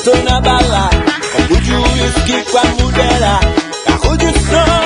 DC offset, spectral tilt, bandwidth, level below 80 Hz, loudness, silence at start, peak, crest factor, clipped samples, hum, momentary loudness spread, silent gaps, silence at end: under 0.1%; -4.5 dB/octave; 11 kHz; -18 dBFS; -12 LUFS; 0 s; 0 dBFS; 10 dB; under 0.1%; none; 3 LU; none; 0 s